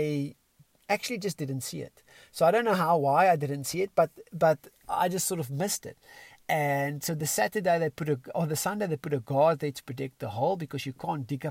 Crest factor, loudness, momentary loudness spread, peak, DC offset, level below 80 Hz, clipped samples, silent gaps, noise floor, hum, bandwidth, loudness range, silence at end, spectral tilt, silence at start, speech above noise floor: 18 dB; -28 LUFS; 11 LU; -10 dBFS; under 0.1%; -68 dBFS; under 0.1%; none; -63 dBFS; none; 16 kHz; 3 LU; 0 s; -5 dB/octave; 0 s; 35 dB